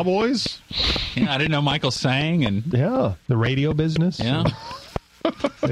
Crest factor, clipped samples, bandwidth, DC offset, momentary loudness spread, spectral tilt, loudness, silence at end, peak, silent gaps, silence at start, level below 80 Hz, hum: 16 dB; under 0.1%; 12 kHz; under 0.1%; 6 LU; -6 dB/octave; -22 LUFS; 0 s; -6 dBFS; none; 0 s; -40 dBFS; none